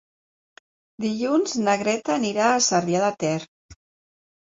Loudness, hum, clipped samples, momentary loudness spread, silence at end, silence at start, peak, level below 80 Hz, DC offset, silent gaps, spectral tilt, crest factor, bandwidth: -22 LUFS; none; under 0.1%; 8 LU; 0.75 s; 1 s; -6 dBFS; -64 dBFS; under 0.1%; 3.48-3.69 s; -3.5 dB/octave; 18 dB; 7.8 kHz